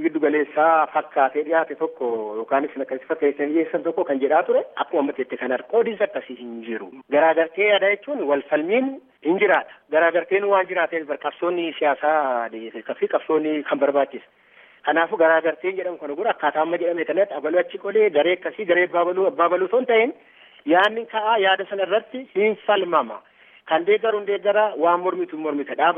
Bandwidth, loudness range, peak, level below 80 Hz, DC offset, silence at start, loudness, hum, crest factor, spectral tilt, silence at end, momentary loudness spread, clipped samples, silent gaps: 3.8 kHz; 3 LU; -4 dBFS; -82 dBFS; under 0.1%; 0 s; -21 LUFS; none; 18 dB; -7 dB/octave; 0 s; 9 LU; under 0.1%; none